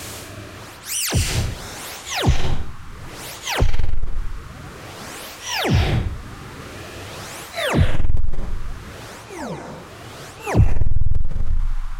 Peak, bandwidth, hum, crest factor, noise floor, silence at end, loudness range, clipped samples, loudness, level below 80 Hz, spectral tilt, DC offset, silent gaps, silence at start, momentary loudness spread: -4 dBFS; 16.5 kHz; none; 14 dB; -37 dBFS; 0 s; 3 LU; under 0.1%; -24 LUFS; -24 dBFS; -4.5 dB/octave; under 0.1%; none; 0 s; 17 LU